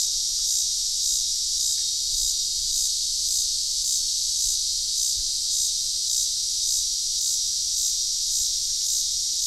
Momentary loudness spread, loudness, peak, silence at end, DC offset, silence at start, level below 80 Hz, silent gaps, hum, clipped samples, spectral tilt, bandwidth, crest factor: 1 LU; -22 LUFS; -10 dBFS; 0 s; under 0.1%; 0 s; -48 dBFS; none; none; under 0.1%; 3.5 dB/octave; 16 kHz; 14 dB